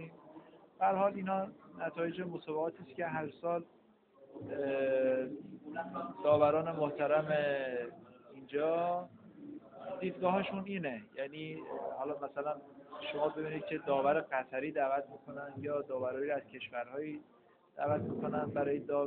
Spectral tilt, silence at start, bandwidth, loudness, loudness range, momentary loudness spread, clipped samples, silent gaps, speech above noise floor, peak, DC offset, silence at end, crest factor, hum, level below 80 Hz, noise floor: -5 dB/octave; 0 s; 4.3 kHz; -36 LUFS; 6 LU; 16 LU; under 0.1%; none; 28 dB; -16 dBFS; under 0.1%; 0 s; 20 dB; none; -76 dBFS; -63 dBFS